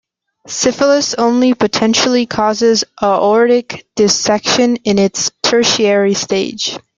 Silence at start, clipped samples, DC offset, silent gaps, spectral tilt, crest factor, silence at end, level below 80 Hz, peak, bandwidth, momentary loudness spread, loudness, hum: 0.45 s; under 0.1%; under 0.1%; none; -3 dB/octave; 14 dB; 0.2 s; -52 dBFS; 0 dBFS; 9.6 kHz; 5 LU; -13 LUFS; none